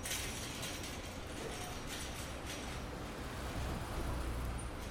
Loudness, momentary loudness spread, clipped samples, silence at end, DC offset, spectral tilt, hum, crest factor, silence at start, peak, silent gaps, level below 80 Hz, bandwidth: -43 LUFS; 3 LU; under 0.1%; 0 s; under 0.1%; -3.5 dB/octave; none; 14 dB; 0 s; -28 dBFS; none; -46 dBFS; over 20 kHz